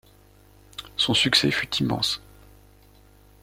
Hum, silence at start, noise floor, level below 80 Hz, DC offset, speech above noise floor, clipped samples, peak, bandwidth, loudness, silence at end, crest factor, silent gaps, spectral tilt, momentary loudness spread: 50 Hz at -45 dBFS; 0.8 s; -54 dBFS; -52 dBFS; under 0.1%; 31 dB; under 0.1%; -4 dBFS; 16.5 kHz; -22 LUFS; 1.25 s; 24 dB; none; -3.5 dB/octave; 18 LU